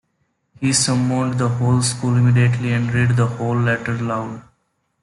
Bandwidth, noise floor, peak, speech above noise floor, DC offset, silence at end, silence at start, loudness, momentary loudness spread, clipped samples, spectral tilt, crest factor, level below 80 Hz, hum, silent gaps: 11.5 kHz; -68 dBFS; -4 dBFS; 51 dB; under 0.1%; 0.6 s; 0.6 s; -18 LUFS; 8 LU; under 0.1%; -5 dB/octave; 14 dB; -52 dBFS; none; none